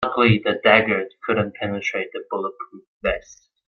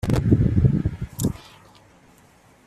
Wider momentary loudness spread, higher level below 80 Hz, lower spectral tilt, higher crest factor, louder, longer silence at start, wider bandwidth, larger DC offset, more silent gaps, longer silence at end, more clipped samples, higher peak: first, 14 LU vs 10 LU; second, -48 dBFS vs -34 dBFS; second, -6 dB/octave vs -7.5 dB/octave; about the same, 20 dB vs 20 dB; about the same, -21 LUFS vs -22 LUFS; about the same, 0 s vs 0.05 s; second, 7 kHz vs 14.5 kHz; neither; first, 2.87-3.01 s vs none; second, 0.35 s vs 1.3 s; neither; about the same, -2 dBFS vs -4 dBFS